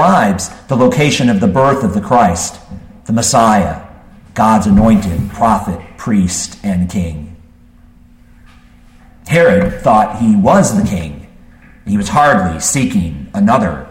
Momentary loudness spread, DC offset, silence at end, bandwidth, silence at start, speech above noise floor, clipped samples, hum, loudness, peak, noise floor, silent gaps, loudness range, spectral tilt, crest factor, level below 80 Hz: 12 LU; under 0.1%; 0 s; 16.5 kHz; 0 s; 31 dB; under 0.1%; none; -12 LUFS; 0 dBFS; -42 dBFS; none; 5 LU; -5.5 dB/octave; 12 dB; -32 dBFS